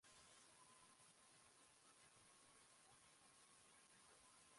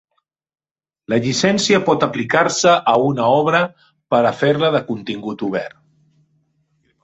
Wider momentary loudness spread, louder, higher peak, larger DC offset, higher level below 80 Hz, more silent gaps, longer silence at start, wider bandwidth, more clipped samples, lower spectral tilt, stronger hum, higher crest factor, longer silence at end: second, 2 LU vs 11 LU; second, -69 LUFS vs -17 LUFS; second, -56 dBFS vs 0 dBFS; neither; second, under -90 dBFS vs -58 dBFS; neither; second, 0 s vs 1.1 s; first, 11.5 kHz vs 8.2 kHz; neither; second, -1 dB/octave vs -4.5 dB/octave; neither; about the same, 14 dB vs 18 dB; second, 0 s vs 1.35 s